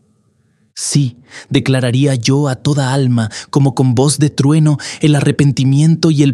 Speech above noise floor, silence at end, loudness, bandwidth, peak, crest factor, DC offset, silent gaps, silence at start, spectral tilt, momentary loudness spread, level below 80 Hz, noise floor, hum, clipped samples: 44 dB; 0 s; -13 LUFS; 12 kHz; 0 dBFS; 12 dB; under 0.1%; none; 0.75 s; -6 dB/octave; 6 LU; -52 dBFS; -56 dBFS; none; under 0.1%